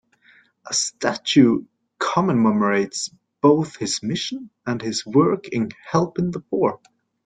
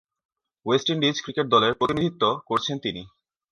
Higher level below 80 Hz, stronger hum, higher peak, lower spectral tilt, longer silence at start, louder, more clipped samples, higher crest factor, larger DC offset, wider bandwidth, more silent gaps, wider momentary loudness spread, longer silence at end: about the same, -60 dBFS vs -58 dBFS; neither; about the same, -4 dBFS vs -6 dBFS; about the same, -4.5 dB/octave vs -5 dB/octave; about the same, 0.65 s vs 0.65 s; about the same, -21 LUFS vs -23 LUFS; neither; about the same, 18 dB vs 20 dB; neither; second, 9.6 kHz vs 11 kHz; neither; about the same, 9 LU vs 11 LU; about the same, 0.5 s vs 0.45 s